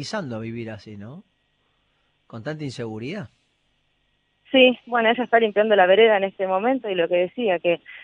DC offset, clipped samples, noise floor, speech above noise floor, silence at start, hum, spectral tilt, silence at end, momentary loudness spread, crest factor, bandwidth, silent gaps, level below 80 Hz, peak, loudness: under 0.1%; under 0.1%; -68 dBFS; 47 dB; 0 s; none; -5.5 dB/octave; 0.05 s; 20 LU; 20 dB; 9.8 kHz; none; -68 dBFS; -2 dBFS; -20 LUFS